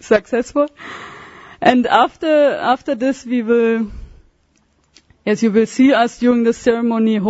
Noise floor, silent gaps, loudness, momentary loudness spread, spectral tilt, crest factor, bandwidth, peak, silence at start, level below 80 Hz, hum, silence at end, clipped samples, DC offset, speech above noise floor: -59 dBFS; none; -16 LUFS; 11 LU; -5.5 dB/octave; 16 dB; 8 kHz; 0 dBFS; 0 s; -46 dBFS; none; 0 s; under 0.1%; under 0.1%; 44 dB